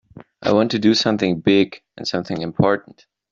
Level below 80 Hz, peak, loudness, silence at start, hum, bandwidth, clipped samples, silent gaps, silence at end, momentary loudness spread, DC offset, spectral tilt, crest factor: -54 dBFS; -2 dBFS; -19 LUFS; 0.15 s; none; 7.6 kHz; under 0.1%; none; 0.5 s; 9 LU; under 0.1%; -5.5 dB/octave; 16 dB